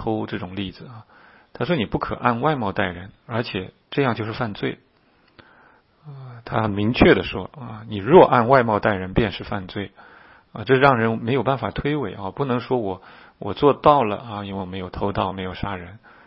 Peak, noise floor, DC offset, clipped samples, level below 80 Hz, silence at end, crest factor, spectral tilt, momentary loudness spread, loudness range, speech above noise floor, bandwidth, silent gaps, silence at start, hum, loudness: 0 dBFS; -59 dBFS; under 0.1%; under 0.1%; -44 dBFS; 0.3 s; 22 dB; -10 dB/octave; 19 LU; 9 LU; 38 dB; 5.8 kHz; none; 0 s; none; -21 LUFS